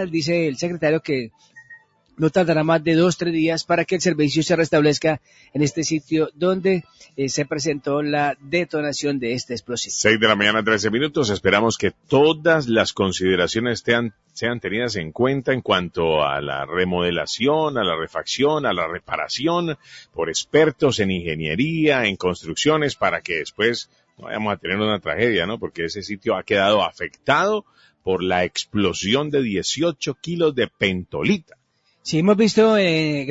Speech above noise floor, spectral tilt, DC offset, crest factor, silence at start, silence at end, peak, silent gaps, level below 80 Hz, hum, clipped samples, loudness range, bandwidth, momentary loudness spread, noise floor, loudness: 28 dB; -4.5 dB/octave; under 0.1%; 20 dB; 0 s; 0 s; 0 dBFS; none; -52 dBFS; none; under 0.1%; 3 LU; 8 kHz; 9 LU; -48 dBFS; -20 LUFS